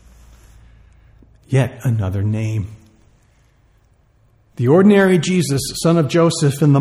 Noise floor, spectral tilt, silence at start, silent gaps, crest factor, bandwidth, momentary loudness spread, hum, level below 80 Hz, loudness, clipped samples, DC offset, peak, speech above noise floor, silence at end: -55 dBFS; -6.5 dB/octave; 1.5 s; none; 16 dB; 15.5 kHz; 10 LU; none; -48 dBFS; -16 LUFS; under 0.1%; under 0.1%; -2 dBFS; 40 dB; 0 s